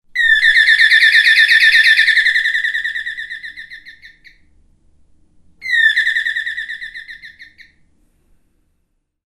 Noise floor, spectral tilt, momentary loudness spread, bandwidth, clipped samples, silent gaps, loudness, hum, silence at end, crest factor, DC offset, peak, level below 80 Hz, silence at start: -67 dBFS; 4 dB/octave; 21 LU; 15 kHz; under 0.1%; none; -10 LUFS; none; 1.85 s; 16 dB; under 0.1%; 0 dBFS; -54 dBFS; 0.15 s